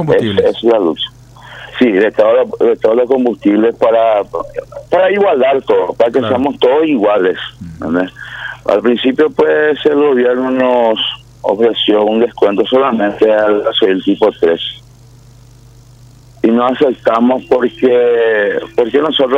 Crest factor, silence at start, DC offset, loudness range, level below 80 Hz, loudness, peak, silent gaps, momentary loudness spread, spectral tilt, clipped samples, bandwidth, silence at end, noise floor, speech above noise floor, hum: 12 dB; 0 s; under 0.1%; 3 LU; -48 dBFS; -12 LUFS; 0 dBFS; none; 8 LU; -6.5 dB/octave; under 0.1%; 7.8 kHz; 0 s; -40 dBFS; 28 dB; none